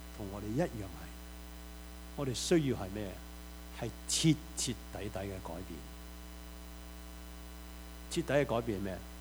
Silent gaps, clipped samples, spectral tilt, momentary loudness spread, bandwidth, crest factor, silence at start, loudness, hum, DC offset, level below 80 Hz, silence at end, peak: none; under 0.1%; -4.5 dB/octave; 18 LU; over 20 kHz; 22 dB; 0 s; -36 LUFS; none; under 0.1%; -50 dBFS; 0 s; -16 dBFS